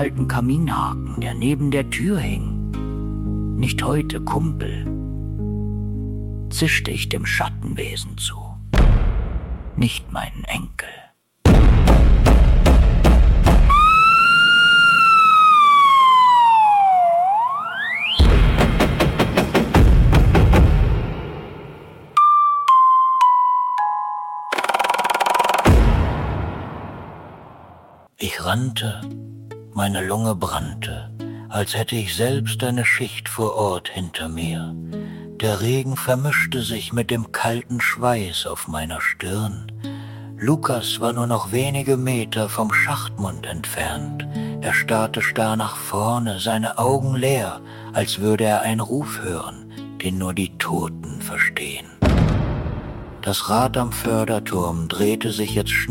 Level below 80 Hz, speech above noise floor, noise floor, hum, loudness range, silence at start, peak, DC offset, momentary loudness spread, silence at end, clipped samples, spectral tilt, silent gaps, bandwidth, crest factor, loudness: -24 dBFS; 24 dB; -46 dBFS; none; 11 LU; 0 s; -4 dBFS; under 0.1%; 17 LU; 0 s; under 0.1%; -5 dB/octave; none; 17 kHz; 14 dB; -18 LUFS